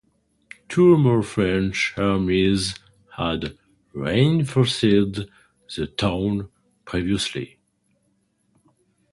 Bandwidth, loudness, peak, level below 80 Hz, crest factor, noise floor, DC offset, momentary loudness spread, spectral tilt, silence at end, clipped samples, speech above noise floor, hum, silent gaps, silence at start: 11.5 kHz; -21 LUFS; -4 dBFS; -46 dBFS; 18 dB; -68 dBFS; under 0.1%; 17 LU; -6 dB/octave; 1.65 s; under 0.1%; 47 dB; none; none; 0.7 s